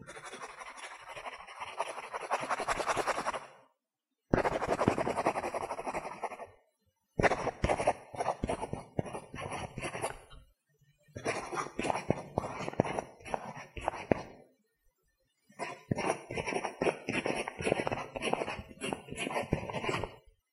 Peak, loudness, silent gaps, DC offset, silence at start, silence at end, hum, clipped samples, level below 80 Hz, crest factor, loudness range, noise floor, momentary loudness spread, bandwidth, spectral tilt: -6 dBFS; -36 LUFS; none; under 0.1%; 0 s; 0.35 s; none; under 0.1%; -54 dBFS; 30 dB; 5 LU; -88 dBFS; 13 LU; 15 kHz; -5 dB/octave